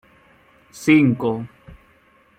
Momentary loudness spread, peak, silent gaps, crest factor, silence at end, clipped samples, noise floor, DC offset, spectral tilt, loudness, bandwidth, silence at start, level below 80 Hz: 16 LU; -2 dBFS; none; 20 dB; 0.65 s; under 0.1%; -56 dBFS; under 0.1%; -6.5 dB/octave; -18 LUFS; 14.5 kHz; 0.75 s; -56 dBFS